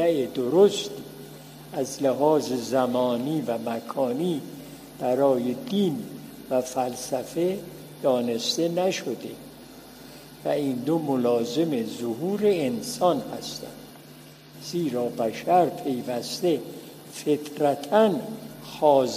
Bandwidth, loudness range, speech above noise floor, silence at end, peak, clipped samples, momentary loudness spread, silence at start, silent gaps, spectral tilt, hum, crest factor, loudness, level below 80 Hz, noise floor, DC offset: 15.5 kHz; 3 LU; 22 dB; 0 s; -6 dBFS; under 0.1%; 20 LU; 0 s; none; -5 dB/octave; none; 20 dB; -25 LUFS; -66 dBFS; -47 dBFS; under 0.1%